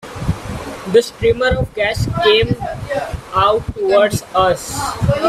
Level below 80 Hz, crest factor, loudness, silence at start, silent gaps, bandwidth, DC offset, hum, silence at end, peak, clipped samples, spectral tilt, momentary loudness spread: -34 dBFS; 16 dB; -16 LUFS; 0.05 s; none; 15 kHz; under 0.1%; none; 0 s; 0 dBFS; under 0.1%; -5 dB/octave; 10 LU